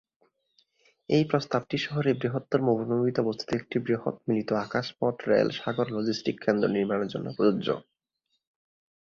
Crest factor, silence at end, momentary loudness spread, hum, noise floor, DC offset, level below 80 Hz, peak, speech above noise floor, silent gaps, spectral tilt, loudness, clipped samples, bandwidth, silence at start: 20 dB; 1.2 s; 5 LU; none; -79 dBFS; under 0.1%; -66 dBFS; -8 dBFS; 52 dB; none; -7 dB/octave; -28 LUFS; under 0.1%; 7.6 kHz; 1.1 s